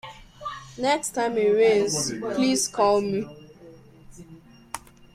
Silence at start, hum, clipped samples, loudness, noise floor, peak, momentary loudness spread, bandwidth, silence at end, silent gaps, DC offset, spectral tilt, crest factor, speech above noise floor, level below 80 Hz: 0.05 s; none; under 0.1%; -23 LUFS; -49 dBFS; -8 dBFS; 19 LU; 15.5 kHz; 0.35 s; none; under 0.1%; -3.5 dB/octave; 16 dB; 26 dB; -56 dBFS